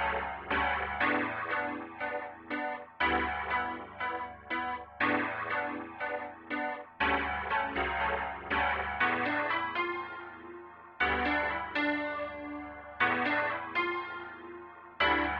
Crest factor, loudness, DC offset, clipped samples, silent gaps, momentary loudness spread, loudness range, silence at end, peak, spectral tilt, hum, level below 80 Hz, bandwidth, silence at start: 20 dB; -32 LUFS; under 0.1%; under 0.1%; none; 12 LU; 3 LU; 0 s; -14 dBFS; -1.5 dB/octave; none; -54 dBFS; 6.4 kHz; 0 s